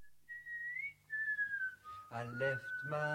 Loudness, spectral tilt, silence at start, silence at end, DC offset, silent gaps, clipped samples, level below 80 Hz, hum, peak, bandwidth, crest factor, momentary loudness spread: -40 LUFS; -6 dB/octave; 0 s; 0 s; under 0.1%; none; under 0.1%; -78 dBFS; none; -24 dBFS; 16.5 kHz; 18 dB; 12 LU